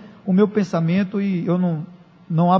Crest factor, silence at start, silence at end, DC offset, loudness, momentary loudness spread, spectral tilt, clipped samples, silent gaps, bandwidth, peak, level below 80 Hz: 16 dB; 0 s; 0 s; under 0.1%; -20 LUFS; 8 LU; -9 dB/octave; under 0.1%; none; 6.8 kHz; -2 dBFS; -66 dBFS